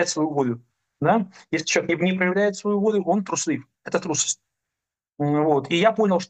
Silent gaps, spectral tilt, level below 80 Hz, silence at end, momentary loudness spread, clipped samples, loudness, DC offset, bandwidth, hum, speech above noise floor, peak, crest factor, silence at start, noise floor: none; -4.5 dB/octave; -68 dBFS; 0.05 s; 8 LU; under 0.1%; -23 LUFS; under 0.1%; 9.2 kHz; none; 65 dB; -4 dBFS; 20 dB; 0 s; -87 dBFS